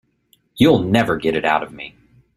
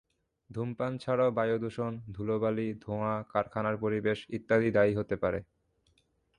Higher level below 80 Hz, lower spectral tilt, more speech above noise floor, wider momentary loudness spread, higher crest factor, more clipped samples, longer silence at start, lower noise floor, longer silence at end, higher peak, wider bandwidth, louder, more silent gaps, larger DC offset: first, -48 dBFS vs -60 dBFS; second, -6.5 dB/octave vs -8 dB/octave; about the same, 44 dB vs 41 dB; first, 19 LU vs 10 LU; about the same, 18 dB vs 18 dB; neither; about the same, 0.55 s vs 0.5 s; second, -61 dBFS vs -72 dBFS; second, 0.5 s vs 0.95 s; first, -2 dBFS vs -14 dBFS; first, 14.5 kHz vs 10.5 kHz; first, -17 LUFS vs -31 LUFS; neither; neither